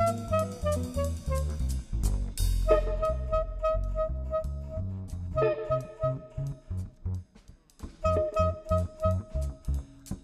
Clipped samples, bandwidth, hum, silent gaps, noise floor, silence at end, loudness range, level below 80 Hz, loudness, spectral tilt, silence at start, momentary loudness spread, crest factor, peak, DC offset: under 0.1%; 15 kHz; none; none; -55 dBFS; 0.05 s; 3 LU; -34 dBFS; -31 LUFS; -7 dB/octave; 0 s; 10 LU; 20 dB; -10 dBFS; under 0.1%